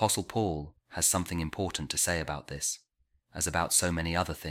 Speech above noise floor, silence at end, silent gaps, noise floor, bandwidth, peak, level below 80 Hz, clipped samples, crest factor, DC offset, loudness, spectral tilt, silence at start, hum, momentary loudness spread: 38 dB; 0 s; none; -68 dBFS; 16.5 kHz; -12 dBFS; -48 dBFS; under 0.1%; 20 dB; under 0.1%; -30 LUFS; -3 dB/octave; 0 s; none; 11 LU